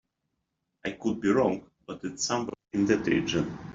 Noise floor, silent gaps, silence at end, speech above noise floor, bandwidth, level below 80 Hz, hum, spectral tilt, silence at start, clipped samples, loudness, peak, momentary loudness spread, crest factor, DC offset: -81 dBFS; none; 0 s; 53 dB; 7.8 kHz; -58 dBFS; none; -4.5 dB/octave; 0.85 s; under 0.1%; -28 LUFS; -10 dBFS; 13 LU; 18 dB; under 0.1%